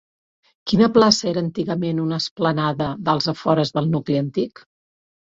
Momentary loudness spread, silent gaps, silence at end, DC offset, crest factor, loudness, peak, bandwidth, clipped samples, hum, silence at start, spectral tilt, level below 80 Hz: 9 LU; 2.31-2.36 s; 0.7 s; under 0.1%; 20 dB; -20 LUFS; -2 dBFS; 7.8 kHz; under 0.1%; none; 0.65 s; -5.5 dB/octave; -54 dBFS